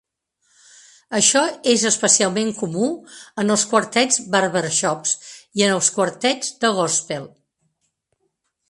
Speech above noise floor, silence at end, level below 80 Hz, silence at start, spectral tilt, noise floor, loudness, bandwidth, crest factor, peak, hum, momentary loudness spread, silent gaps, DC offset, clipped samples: 52 dB; 1.45 s; -66 dBFS; 1.1 s; -2.5 dB/octave; -72 dBFS; -18 LUFS; 11.5 kHz; 20 dB; 0 dBFS; none; 10 LU; none; under 0.1%; under 0.1%